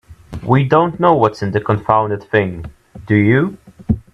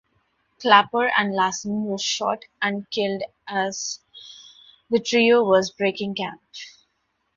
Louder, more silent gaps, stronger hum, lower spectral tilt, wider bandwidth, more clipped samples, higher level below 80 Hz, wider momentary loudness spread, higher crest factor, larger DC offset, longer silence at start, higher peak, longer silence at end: first, -15 LUFS vs -22 LUFS; neither; neither; first, -8.5 dB/octave vs -3.5 dB/octave; about the same, 8 kHz vs 7.6 kHz; neither; first, -40 dBFS vs -66 dBFS; second, 17 LU vs 22 LU; second, 16 dB vs 22 dB; neither; second, 0.1 s vs 0.6 s; about the same, 0 dBFS vs 0 dBFS; second, 0.15 s vs 0.7 s